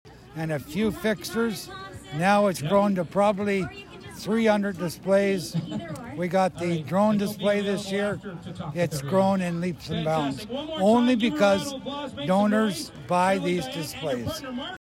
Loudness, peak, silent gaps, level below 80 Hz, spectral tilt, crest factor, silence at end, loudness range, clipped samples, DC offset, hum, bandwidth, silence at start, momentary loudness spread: -25 LUFS; -10 dBFS; none; -56 dBFS; -6 dB/octave; 16 dB; 0.1 s; 3 LU; under 0.1%; under 0.1%; none; 16 kHz; 0.05 s; 13 LU